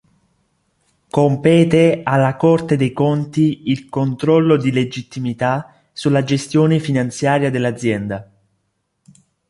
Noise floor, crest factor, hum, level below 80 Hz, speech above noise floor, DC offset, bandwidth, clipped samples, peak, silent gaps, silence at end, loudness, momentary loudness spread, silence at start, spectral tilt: -69 dBFS; 16 dB; none; -54 dBFS; 54 dB; under 0.1%; 11.5 kHz; under 0.1%; -2 dBFS; none; 1.25 s; -17 LUFS; 10 LU; 1.15 s; -7 dB/octave